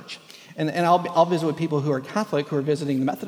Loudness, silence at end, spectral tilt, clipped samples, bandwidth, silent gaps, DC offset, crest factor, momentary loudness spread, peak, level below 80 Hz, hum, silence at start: -23 LUFS; 0 s; -6.5 dB/octave; under 0.1%; 18 kHz; none; under 0.1%; 18 dB; 11 LU; -6 dBFS; -74 dBFS; none; 0 s